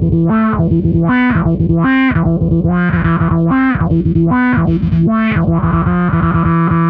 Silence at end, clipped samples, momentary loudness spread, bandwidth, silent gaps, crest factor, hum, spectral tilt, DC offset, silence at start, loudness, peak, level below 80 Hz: 0 s; under 0.1%; 2 LU; 4 kHz; none; 10 dB; none; -11.5 dB/octave; under 0.1%; 0 s; -12 LUFS; -2 dBFS; -26 dBFS